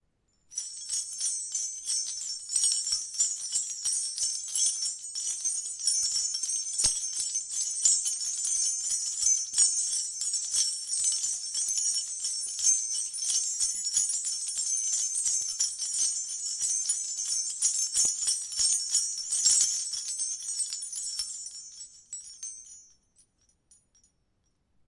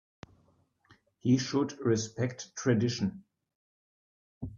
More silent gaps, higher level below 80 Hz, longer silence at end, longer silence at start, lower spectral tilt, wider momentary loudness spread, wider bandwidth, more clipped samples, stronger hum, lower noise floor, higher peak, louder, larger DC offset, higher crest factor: second, none vs 3.55-4.41 s; about the same, -66 dBFS vs -64 dBFS; first, 2.05 s vs 0 s; second, 0.5 s vs 1.25 s; second, 4 dB/octave vs -5.5 dB/octave; about the same, 9 LU vs 8 LU; first, 11.5 kHz vs 7.4 kHz; neither; neither; first, -74 dBFS vs -69 dBFS; first, -6 dBFS vs -14 dBFS; first, -27 LUFS vs -31 LUFS; neither; about the same, 24 dB vs 20 dB